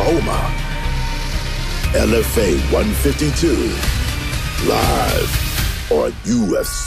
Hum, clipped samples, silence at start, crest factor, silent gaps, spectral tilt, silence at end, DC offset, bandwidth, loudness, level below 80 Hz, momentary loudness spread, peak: none; under 0.1%; 0 s; 16 dB; none; -5 dB/octave; 0 s; under 0.1%; 15.5 kHz; -18 LUFS; -22 dBFS; 7 LU; -2 dBFS